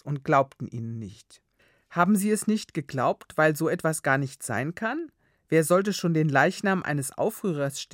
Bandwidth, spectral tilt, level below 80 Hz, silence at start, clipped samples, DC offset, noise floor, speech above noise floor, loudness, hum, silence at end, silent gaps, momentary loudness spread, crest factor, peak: 16.5 kHz; -5.5 dB/octave; -70 dBFS; 0.05 s; under 0.1%; under 0.1%; -57 dBFS; 31 dB; -26 LUFS; none; 0.1 s; none; 12 LU; 20 dB; -6 dBFS